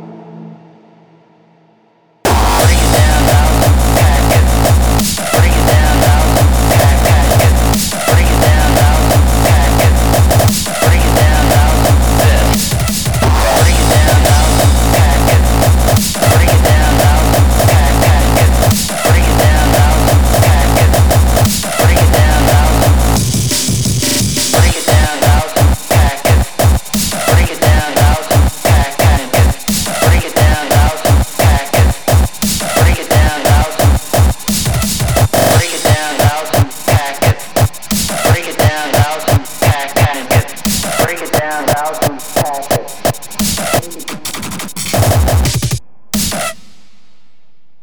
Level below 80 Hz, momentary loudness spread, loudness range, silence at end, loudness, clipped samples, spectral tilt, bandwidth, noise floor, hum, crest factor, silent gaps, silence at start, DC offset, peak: -14 dBFS; 5 LU; 5 LU; 1.3 s; -11 LUFS; under 0.1%; -4.5 dB/octave; over 20 kHz; -55 dBFS; none; 10 dB; none; 0 s; 4%; 0 dBFS